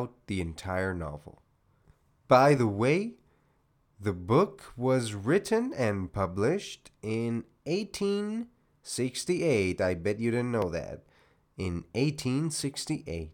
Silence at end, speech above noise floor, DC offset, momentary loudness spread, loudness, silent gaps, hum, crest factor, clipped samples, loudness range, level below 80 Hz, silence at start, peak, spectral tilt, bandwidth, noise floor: 0 s; 40 dB; under 0.1%; 12 LU; -29 LUFS; none; none; 22 dB; under 0.1%; 4 LU; -58 dBFS; 0 s; -8 dBFS; -6 dB/octave; 17.5 kHz; -69 dBFS